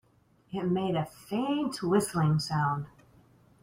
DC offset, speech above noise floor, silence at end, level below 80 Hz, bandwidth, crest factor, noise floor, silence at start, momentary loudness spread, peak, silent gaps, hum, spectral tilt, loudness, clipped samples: under 0.1%; 36 dB; 0.75 s; -62 dBFS; 16 kHz; 18 dB; -65 dBFS; 0.5 s; 8 LU; -12 dBFS; none; none; -6 dB/octave; -30 LUFS; under 0.1%